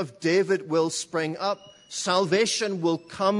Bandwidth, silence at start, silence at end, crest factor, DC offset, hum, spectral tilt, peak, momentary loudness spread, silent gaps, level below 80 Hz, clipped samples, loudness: 11 kHz; 0 s; 0 s; 16 dB; under 0.1%; none; -4 dB/octave; -8 dBFS; 7 LU; none; -72 dBFS; under 0.1%; -25 LUFS